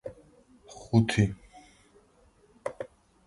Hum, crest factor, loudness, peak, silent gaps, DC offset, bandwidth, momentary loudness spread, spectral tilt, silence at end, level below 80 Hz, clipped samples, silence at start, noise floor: none; 22 dB; -28 LUFS; -10 dBFS; none; under 0.1%; 11.5 kHz; 23 LU; -6.5 dB/octave; 0.4 s; -52 dBFS; under 0.1%; 0.05 s; -62 dBFS